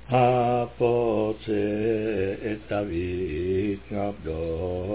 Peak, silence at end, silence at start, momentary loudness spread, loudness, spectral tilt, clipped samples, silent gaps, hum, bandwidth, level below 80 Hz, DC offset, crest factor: -10 dBFS; 0 s; 0.05 s; 9 LU; -26 LUFS; -11.5 dB/octave; under 0.1%; none; none; 4 kHz; -44 dBFS; 0.3%; 16 dB